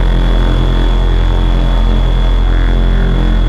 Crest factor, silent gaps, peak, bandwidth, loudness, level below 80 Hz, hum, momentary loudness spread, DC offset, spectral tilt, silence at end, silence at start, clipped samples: 8 dB; none; -2 dBFS; 5.2 kHz; -14 LUFS; -10 dBFS; none; 0 LU; under 0.1%; -7.5 dB/octave; 0 s; 0 s; under 0.1%